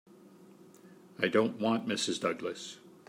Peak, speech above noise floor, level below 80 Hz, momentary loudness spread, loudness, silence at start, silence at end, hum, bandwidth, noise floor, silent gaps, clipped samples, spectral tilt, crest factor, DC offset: -12 dBFS; 25 dB; -82 dBFS; 15 LU; -32 LUFS; 0.25 s; 0.2 s; none; 16 kHz; -56 dBFS; none; under 0.1%; -4 dB/octave; 22 dB; under 0.1%